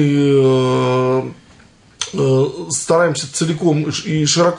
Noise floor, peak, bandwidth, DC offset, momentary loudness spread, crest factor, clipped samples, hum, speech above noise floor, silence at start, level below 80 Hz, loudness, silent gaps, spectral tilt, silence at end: -47 dBFS; -2 dBFS; 11 kHz; under 0.1%; 8 LU; 14 dB; under 0.1%; none; 32 dB; 0 s; -56 dBFS; -16 LUFS; none; -5 dB/octave; 0 s